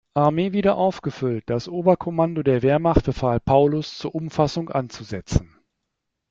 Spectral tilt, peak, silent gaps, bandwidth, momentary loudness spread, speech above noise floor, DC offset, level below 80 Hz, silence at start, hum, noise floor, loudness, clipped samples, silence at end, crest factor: -7.5 dB/octave; -2 dBFS; none; 7.8 kHz; 9 LU; 58 dB; under 0.1%; -38 dBFS; 0.15 s; none; -79 dBFS; -22 LUFS; under 0.1%; 0.85 s; 18 dB